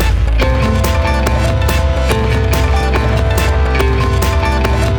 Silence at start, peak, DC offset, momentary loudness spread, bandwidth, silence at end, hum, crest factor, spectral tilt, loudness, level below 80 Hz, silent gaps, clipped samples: 0 s; 0 dBFS; under 0.1%; 1 LU; 19.5 kHz; 0 s; none; 10 dB; -5.5 dB/octave; -14 LUFS; -14 dBFS; none; under 0.1%